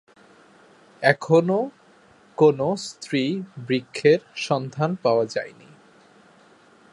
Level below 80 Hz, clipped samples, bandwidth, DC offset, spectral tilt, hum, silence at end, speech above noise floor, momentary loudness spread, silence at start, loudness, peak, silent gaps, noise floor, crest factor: -68 dBFS; under 0.1%; 11.5 kHz; under 0.1%; -6 dB/octave; none; 1.45 s; 33 dB; 12 LU; 1 s; -22 LUFS; -2 dBFS; none; -54 dBFS; 22 dB